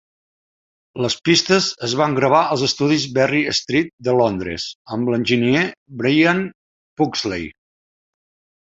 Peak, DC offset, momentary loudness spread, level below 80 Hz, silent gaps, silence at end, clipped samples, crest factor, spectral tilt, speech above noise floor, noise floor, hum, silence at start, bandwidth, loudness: -2 dBFS; under 0.1%; 10 LU; -52 dBFS; 3.93-3.98 s, 4.75-4.85 s, 5.77-5.86 s, 6.55-6.96 s; 1.15 s; under 0.1%; 18 dB; -4.5 dB/octave; over 72 dB; under -90 dBFS; none; 0.95 s; 8 kHz; -18 LUFS